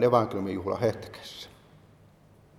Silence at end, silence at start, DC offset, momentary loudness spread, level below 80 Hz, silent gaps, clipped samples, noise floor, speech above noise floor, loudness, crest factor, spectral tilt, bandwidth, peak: 1.1 s; 0 s; under 0.1%; 18 LU; -62 dBFS; none; under 0.1%; -57 dBFS; 30 dB; -29 LUFS; 24 dB; -7 dB/octave; 14.5 kHz; -6 dBFS